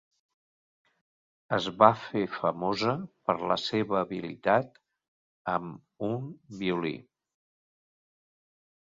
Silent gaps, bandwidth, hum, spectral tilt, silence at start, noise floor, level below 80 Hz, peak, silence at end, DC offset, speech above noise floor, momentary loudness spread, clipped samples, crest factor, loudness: 5.08-5.45 s; 7.8 kHz; none; -6 dB/octave; 1.5 s; under -90 dBFS; -68 dBFS; -2 dBFS; 1.8 s; under 0.1%; over 61 dB; 14 LU; under 0.1%; 28 dB; -29 LUFS